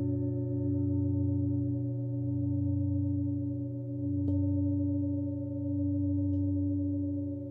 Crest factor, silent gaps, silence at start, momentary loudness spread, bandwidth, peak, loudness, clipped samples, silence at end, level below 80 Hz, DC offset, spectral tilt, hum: 10 dB; none; 0 s; 4 LU; 1.3 kHz; -20 dBFS; -32 LUFS; under 0.1%; 0 s; -60 dBFS; under 0.1%; -15 dB/octave; none